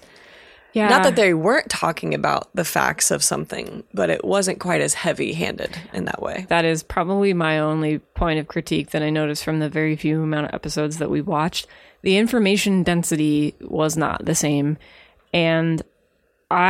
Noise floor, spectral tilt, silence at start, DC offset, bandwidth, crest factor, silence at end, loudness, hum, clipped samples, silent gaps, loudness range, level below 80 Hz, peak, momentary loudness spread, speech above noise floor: -64 dBFS; -4.5 dB/octave; 0.75 s; under 0.1%; 16.5 kHz; 20 dB; 0 s; -21 LUFS; none; under 0.1%; none; 4 LU; -44 dBFS; 0 dBFS; 9 LU; 44 dB